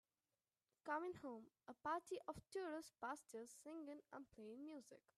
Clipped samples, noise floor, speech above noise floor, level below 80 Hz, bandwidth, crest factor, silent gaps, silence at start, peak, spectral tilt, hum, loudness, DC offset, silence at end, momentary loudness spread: under 0.1%; under -90 dBFS; over 37 dB; -86 dBFS; 13.5 kHz; 20 dB; none; 0.85 s; -34 dBFS; -4.5 dB/octave; none; -53 LUFS; under 0.1%; 0.2 s; 11 LU